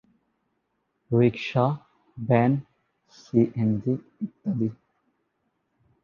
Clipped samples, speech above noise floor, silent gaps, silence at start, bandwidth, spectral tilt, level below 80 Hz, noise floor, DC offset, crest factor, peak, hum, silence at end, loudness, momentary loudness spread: under 0.1%; 52 dB; none; 1.1 s; 7 kHz; -9 dB/octave; -62 dBFS; -75 dBFS; under 0.1%; 22 dB; -6 dBFS; none; 1.3 s; -25 LUFS; 10 LU